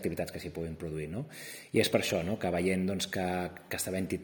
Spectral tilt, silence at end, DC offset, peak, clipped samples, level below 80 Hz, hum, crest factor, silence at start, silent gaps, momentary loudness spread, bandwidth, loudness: -4.5 dB/octave; 0 s; under 0.1%; -12 dBFS; under 0.1%; -62 dBFS; none; 20 dB; 0 s; none; 11 LU; over 20 kHz; -33 LUFS